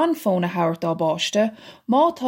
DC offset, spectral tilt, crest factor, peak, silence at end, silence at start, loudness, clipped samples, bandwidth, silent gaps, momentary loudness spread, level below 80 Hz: under 0.1%; -5.5 dB/octave; 14 dB; -6 dBFS; 0 s; 0 s; -22 LUFS; under 0.1%; 16.5 kHz; none; 4 LU; -68 dBFS